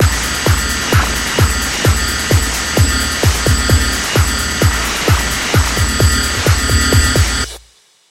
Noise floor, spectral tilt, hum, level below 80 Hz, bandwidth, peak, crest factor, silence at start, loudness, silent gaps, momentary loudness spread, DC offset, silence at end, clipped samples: -48 dBFS; -3.5 dB/octave; none; -20 dBFS; 16.5 kHz; 0 dBFS; 14 dB; 0 s; -13 LUFS; none; 3 LU; under 0.1%; 0.5 s; under 0.1%